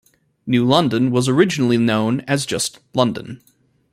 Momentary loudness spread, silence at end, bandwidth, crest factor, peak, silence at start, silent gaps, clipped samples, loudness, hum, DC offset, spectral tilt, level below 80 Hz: 7 LU; 0.55 s; 14.5 kHz; 18 dB; 0 dBFS; 0.45 s; none; under 0.1%; -18 LUFS; none; under 0.1%; -5 dB/octave; -56 dBFS